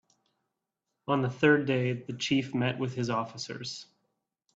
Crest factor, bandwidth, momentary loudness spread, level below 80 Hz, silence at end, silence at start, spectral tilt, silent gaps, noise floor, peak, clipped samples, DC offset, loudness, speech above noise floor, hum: 20 dB; 8 kHz; 14 LU; -68 dBFS; 0.7 s; 1.1 s; -5.5 dB/octave; none; -85 dBFS; -10 dBFS; under 0.1%; under 0.1%; -29 LUFS; 56 dB; none